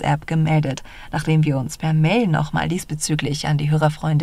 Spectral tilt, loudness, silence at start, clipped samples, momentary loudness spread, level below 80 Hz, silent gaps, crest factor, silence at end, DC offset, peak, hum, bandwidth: -6 dB/octave; -20 LUFS; 0 s; under 0.1%; 7 LU; -42 dBFS; none; 14 dB; 0 s; under 0.1%; -4 dBFS; none; 13.5 kHz